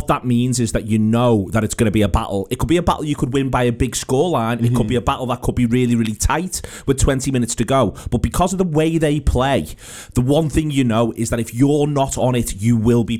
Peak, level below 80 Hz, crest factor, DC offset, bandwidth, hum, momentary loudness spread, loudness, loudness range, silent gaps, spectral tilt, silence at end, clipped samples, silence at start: -2 dBFS; -30 dBFS; 16 dB; 0.4%; 16 kHz; none; 5 LU; -18 LUFS; 1 LU; none; -6 dB/octave; 0 s; under 0.1%; 0 s